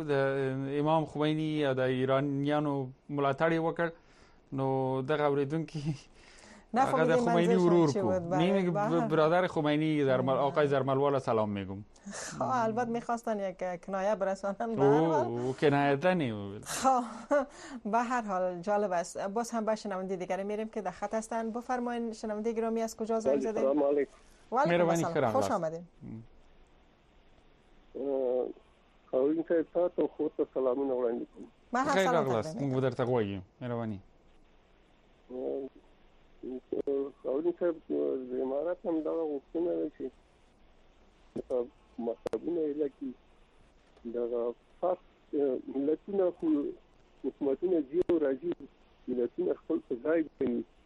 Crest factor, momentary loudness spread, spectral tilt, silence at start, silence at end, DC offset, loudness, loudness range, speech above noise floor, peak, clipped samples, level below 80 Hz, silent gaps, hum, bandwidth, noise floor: 18 dB; 12 LU; -6.5 dB/octave; 0 s; 0.2 s; under 0.1%; -31 LUFS; 9 LU; 32 dB; -14 dBFS; under 0.1%; -64 dBFS; none; none; 11.5 kHz; -63 dBFS